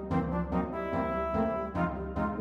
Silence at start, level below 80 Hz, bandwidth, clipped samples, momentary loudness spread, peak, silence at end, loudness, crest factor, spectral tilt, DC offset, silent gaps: 0 s; -44 dBFS; 6.6 kHz; under 0.1%; 3 LU; -18 dBFS; 0 s; -32 LUFS; 14 dB; -9.5 dB/octave; under 0.1%; none